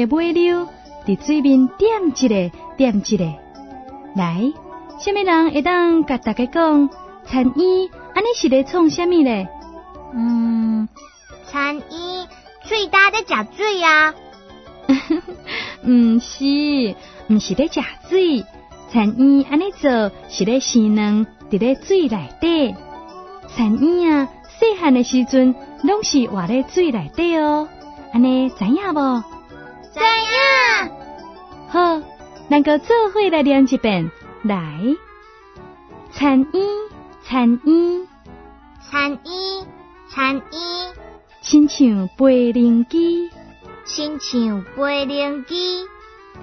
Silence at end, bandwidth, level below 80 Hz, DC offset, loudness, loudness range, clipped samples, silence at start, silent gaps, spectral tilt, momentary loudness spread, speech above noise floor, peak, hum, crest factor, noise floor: 0 s; 6.4 kHz; -48 dBFS; under 0.1%; -17 LUFS; 4 LU; under 0.1%; 0 s; none; -5 dB/octave; 16 LU; 27 dB; -2 dBFS; none; 16 dB; -44 dBFS